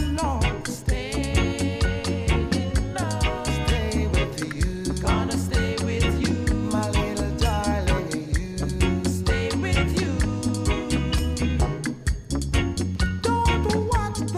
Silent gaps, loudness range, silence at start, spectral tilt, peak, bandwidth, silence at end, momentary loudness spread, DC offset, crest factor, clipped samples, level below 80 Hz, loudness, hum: none; 1 LU; 0 s; -5.5 dB/octave; -8 dBFS; 15 kHz; 0 s; 4 LU; under 0.1%; 16 dB; under 0.1%; -28 dBFS; -25 LUFS; none